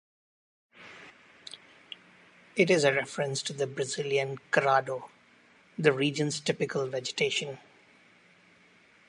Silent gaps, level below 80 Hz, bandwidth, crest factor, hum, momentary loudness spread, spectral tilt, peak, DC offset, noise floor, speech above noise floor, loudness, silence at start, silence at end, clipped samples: none; -80 dBFS; 11.5 kHz; 24 dB; none; 23 LU; -4 dB/octave; -8 dBFS; under 0.1%; -60 dBFS; 32 dB; -29 LUFS; 0.8 s; 1.5 s; under 0.1%